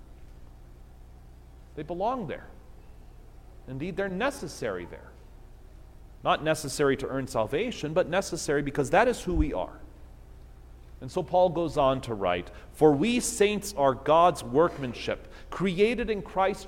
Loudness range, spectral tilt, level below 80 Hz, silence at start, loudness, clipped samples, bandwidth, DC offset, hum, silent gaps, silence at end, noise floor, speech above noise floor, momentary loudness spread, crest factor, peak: 11 LU; -5 dB/octave; -44 dBFS; 0 s; -27 LUFS; under 0.1%; 16.5 kHz; under 0.1%; none; none; 0 s; -49 dBFS; 22 dB; 15 LU; 20 dB; -8 dBFS